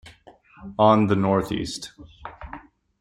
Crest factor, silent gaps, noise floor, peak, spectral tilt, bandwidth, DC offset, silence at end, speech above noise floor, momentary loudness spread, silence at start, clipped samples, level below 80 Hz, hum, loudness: 20 dB; none; -51 dBFS; -4 dBFS; -6.5 dB/octave; 13.5 kHz; under 0.1%; 0.4 s; 30 dB; 24 LU; 0.05 s; under 0.1%; -50 dBFS; none; -21 LUFS